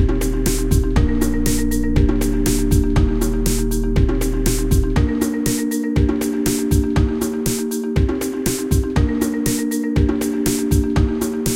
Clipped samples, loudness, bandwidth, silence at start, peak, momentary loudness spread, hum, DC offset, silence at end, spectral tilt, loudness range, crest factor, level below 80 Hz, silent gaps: under 0.1%; -19 LUFS; 17 kHz; 0 s; -2 dBFS; 3 LU; none; under 0.1%; 0 s; -6 dB/octave; 1 LU; 14 dB; -22 dBFS; none